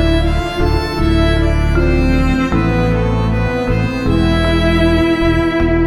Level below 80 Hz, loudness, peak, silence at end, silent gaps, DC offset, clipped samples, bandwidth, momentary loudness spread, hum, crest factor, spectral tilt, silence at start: -18 dBFS; -15 LUFS; -2 dBFS; 0 s; none; 0.3%; under 0.1%; 12 kHz; 4 LU; none; 10 dB; -7 dB/octave; 0 s